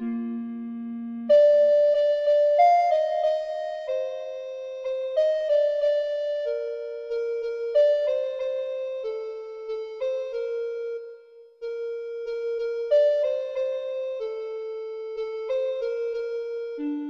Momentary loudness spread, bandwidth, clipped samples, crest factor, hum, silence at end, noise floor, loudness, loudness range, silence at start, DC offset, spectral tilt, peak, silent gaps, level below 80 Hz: 15 LU; 6.8 kHz; under 0.1%; 16 dB; none; 0 s; -49 dBFS; -25 LUFS; 10 LU; 0 s; under 0.1%; -5 dB/octave; -10 dBFS; none; -68 dBFS